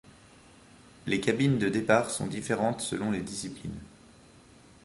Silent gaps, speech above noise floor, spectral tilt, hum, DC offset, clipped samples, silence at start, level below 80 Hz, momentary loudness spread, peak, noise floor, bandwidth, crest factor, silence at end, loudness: none; 27 dB; -5 dB/octave; none; under 0.1%; under 0.1%; 1.05 s; -58 dBFS; 15 LU; -8 dBFS; -55 dBFS; 11.5 kHz; 22 dB; 0.95 s; -29 LUFS